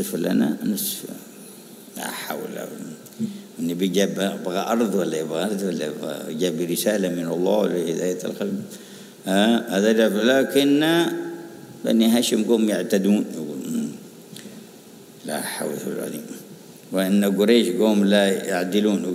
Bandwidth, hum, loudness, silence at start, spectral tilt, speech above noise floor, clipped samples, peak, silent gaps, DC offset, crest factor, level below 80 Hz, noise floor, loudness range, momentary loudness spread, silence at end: 16 kHz; none; -22 LUFS; 0 s; -5 dB/octave; 23 dB; under 0.1%; -2 dBFS; none; under 0.1%; 20 dB; -74 dBFS; -44 dBFS; 9 LU; 20 LU; 0 s